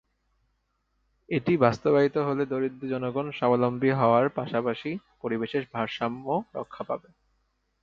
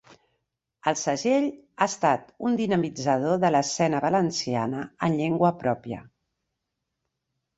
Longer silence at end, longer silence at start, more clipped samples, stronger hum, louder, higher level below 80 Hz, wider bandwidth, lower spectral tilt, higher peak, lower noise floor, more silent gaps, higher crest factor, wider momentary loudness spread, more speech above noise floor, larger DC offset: second, 0.85 s vs 1.55 s; first, 1.3 s vs 0.85 s; neither; neither; about the same, -27 LUFS vs -25 LUFS; about the same, -64 dBFS vs -64 dBFS; second, 7.2 kHz vs 8.2 kHz; first, -8 dB/octave vs -5 dB/octave; about the same, -6 dBFS vs -6 dBFS; second, -74 dBFS vs -82 dBFS; neither; about the same, 22 dB vs 20 dB; first, 12 LU vs 7 LU; second, 48 dB vs 57 dB; neither